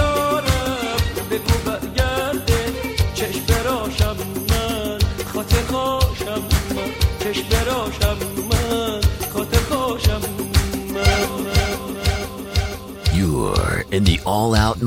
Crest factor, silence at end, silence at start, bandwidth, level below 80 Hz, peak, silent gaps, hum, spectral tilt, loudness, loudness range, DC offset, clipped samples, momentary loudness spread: 18 dB; 0 s; 0 s; 16.5 kHz; -26 dBFS; -2 dBFS; none; none; -5 dB/octave; -20 LUFS; 1 LU; under 0.1%; under 0.1%; 6 LU